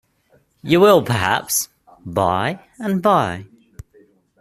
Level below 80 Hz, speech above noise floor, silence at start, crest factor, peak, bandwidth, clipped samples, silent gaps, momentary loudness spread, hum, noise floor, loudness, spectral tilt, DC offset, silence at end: -52 dBFS; 42 dB; 0.65 s; 18 dB; -2 dBFS; 15 kHz; under 0.1%; none; 18 LU; none; -59 dBFS; -18 LUFS; -4.5 dB/octave; under 0.1%; 0.95 s